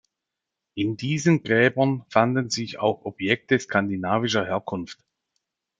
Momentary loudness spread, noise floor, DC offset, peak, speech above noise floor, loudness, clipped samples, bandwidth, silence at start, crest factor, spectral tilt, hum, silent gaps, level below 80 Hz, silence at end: 9 LU; -85 dBFS; under 0.1%; -2 dBFS; 62 dB; -23 LUFS; under 0.1%; 9.4 kHz; 0.75 s; 22 dB; -5.5 dB/octave; none; none; -66 dBFS; 0.85 s